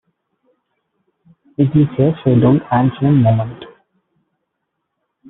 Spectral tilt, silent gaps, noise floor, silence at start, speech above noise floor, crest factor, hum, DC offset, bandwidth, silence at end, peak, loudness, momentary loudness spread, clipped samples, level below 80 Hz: -9 dB/octave; none; -74 dBFS; 1.6 s; 61 dB; 16 dB; none; under 0.1%; 4 kHz; 1.65 s; 0 dBFS; -14 LUFS; 12 LU; under 0.1%; -50 dBFS